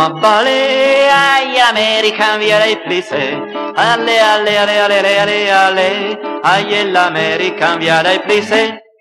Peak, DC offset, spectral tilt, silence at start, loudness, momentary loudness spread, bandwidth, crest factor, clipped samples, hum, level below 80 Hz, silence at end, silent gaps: 0 dBFS; under 0.1%; -3 dB/octave; 0 s; -11 LUFS; 7 LU; 14 kHz; 12 dB; under 0.1%; none; -62 dBFS; 0.2 s; none